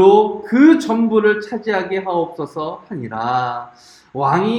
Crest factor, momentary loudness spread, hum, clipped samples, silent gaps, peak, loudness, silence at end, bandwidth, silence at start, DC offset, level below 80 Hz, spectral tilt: 16 dB; 15 LU; none; under 0.1%; none; 0 dBFS; -17 LUFS; 0 s; 9.4 kHz; 0 s; under 0.1%; -62 dBFS; -7 dB/octave